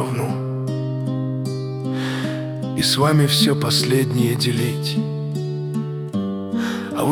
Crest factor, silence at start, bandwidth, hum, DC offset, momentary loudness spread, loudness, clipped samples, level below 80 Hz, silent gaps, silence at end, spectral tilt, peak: 16 dB; 0 s; over 20 kHz; none; under 0.1%; 10 LU; -21 LUFS; under 0.1%; -56 dBFS; none; 0 s; -5 dB/octave; -4 dBFS